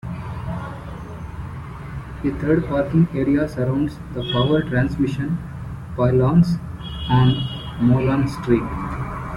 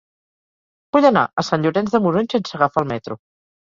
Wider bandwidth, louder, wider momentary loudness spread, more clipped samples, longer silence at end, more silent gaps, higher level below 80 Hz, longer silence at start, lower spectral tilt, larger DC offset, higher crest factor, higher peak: first, 11.5 kHz vs 7.6 kHz; second, -21 LUFS vs -18 LUFS; first, 16 LU vs 12 LU; neither; second, 0 s vs 0.6 s; second, none vs 1.33-1.37 s; first, -38 dBFS vs -58 dBFS; second, 0.05 s vs 0.95 s; first, -8.5 dB/octave vs -6.5 dB/octave; neither; about the same, 16 dB vs 18 dB; about the same, -4 dBFS vs -2 dBFS